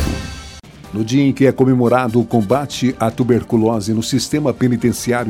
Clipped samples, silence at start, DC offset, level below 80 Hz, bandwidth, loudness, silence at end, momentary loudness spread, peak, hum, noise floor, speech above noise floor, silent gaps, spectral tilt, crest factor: under 0.1%; 0 s; under 0.1%; -36 dBFS; 16.5 kHz; -16 LUFS; 0 s; 11 LU; 0 dBFS; none; -36 dBFS; 21 dB; none; -6 dB/octave; 16 dB